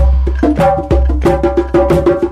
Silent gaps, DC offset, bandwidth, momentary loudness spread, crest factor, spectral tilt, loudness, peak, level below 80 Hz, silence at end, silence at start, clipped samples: none; under 0.1%; 11 kHz; 2 LU; 10 dB; -8.5 dB/octave; -12 LUFS; 0 dBFS; -16 dBFS; 0 s; 0 s; under 0.1%